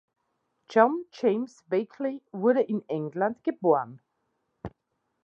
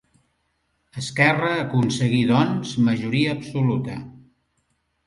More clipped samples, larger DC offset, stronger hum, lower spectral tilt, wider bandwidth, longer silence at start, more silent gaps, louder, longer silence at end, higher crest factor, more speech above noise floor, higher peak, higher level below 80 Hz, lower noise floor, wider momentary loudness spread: neither; neither; neither; first, -7.5 dB/octave vs -6 dB/octave; second, 7.6 kHz vs 11.5 kHz; second, 0.7 s vs 0.95 s; neither; second, -27 LUFS vs -21 LUFS; second, 0.55 s vs 0.9 s; about the same, 22 dB vs 20 dB; about the same, 52 dB vs 50 dB; second, -6 dBFS vs -2 dBFS; second, -66 dBFS vs -56 dBFS; first, -79 dBFS vs -70 dBFS; first, 19 LU vs 14 LU